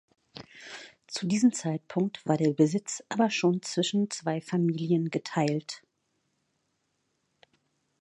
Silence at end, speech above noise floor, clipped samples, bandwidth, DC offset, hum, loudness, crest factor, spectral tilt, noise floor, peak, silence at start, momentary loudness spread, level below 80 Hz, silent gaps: 2.25 s; 49 dB; under 0.1%; 11.5 kHz; under 0.1%; none; -28 LUFS; 20 dB; -5.5 dB/octave; -77 dBFS; -10 dBFS; 0.35 s; 19 LU; -76 dBFS; none